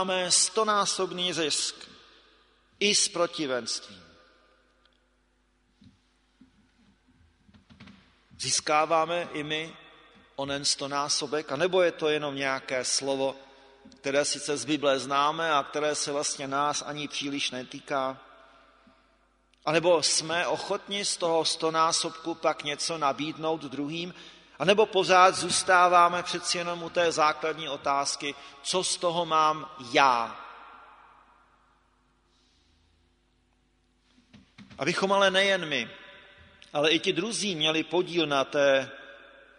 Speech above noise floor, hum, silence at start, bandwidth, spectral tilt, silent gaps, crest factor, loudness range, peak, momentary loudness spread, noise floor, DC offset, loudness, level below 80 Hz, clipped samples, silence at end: 42 dB; none; 0 s; 10.5 kHz; -2 dB/octave; none; 24 dB; 8 LU; -4 dBFS; 12 LU; -69 dBFS; under 0.1%; -26 LUFS; -70 dBFS; under 0.1%; 0.4 s